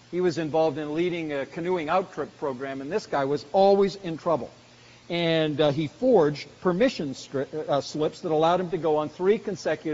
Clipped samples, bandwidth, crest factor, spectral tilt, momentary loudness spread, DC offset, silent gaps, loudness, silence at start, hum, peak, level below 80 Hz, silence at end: under 0.1%; 7.6 kHz; 16 dB; -5 dB/octave; 10 LU; under 0.1%; none; -26 LUFS; 0.1 s; none; -8 dBFS; -62 dBFS; 0 s